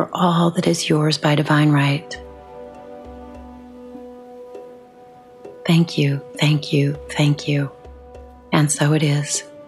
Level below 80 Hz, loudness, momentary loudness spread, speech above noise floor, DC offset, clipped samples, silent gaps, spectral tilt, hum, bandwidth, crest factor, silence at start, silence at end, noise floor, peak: -50 dBFS; -18 LUFS; 22 LU; 27 dB; under 0.1%; under 0.1%; none; -5.5 dB/octave; none; 13 kHz; 16 dB; 0 s; 0.05 s; -44 dBFS; -4 dBFS